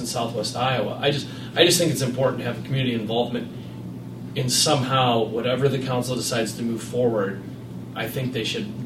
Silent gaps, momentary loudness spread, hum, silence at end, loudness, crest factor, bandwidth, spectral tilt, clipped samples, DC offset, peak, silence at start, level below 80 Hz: none; 16 LU; none; 0 s; -23 LUFS; 22 dB; 16 kHz; -4 dB/octave; under 0.1%; under 0.1%; -2 dBFS; 0 s; -56 dBFS